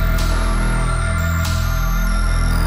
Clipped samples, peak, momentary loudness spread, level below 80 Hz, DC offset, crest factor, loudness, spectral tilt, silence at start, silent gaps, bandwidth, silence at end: under 0.1%; -8 dBFS; 1 LU; -18 dBFS; under 0.1%; 10 dB; -20 LUFS; -5 dB/octave; 0 s; none; 16 kHz; 0 s